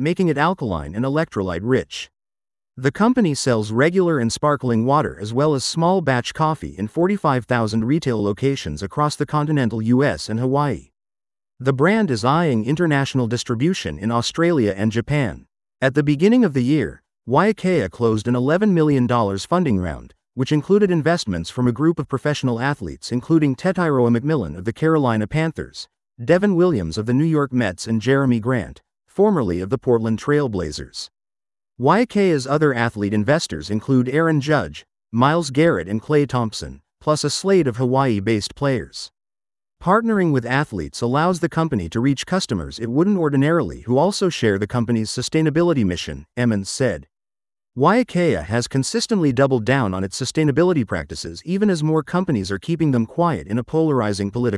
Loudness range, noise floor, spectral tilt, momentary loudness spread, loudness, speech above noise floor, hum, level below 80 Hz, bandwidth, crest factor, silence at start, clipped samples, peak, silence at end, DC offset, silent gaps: 2 LU; under -90 dBFS; -6 dB/octave; 8 LU; -19 LUFS; over 71 dB; none; -48 dBFS; 12 kHz; 18 dB; 0 s; under 0.1%; -2 dBFS; 0 s; under 0.1%; none